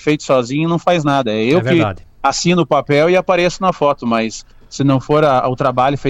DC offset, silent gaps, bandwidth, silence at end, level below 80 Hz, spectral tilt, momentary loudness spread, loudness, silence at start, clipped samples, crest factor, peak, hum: under 0.1%; none; 10 kHz; 0 s; -44 dBFS; -5.5 dB/octave; 6 LU; -15 LUFS; 0 s; under 0.1%; 12 dB; -2 dBFS; none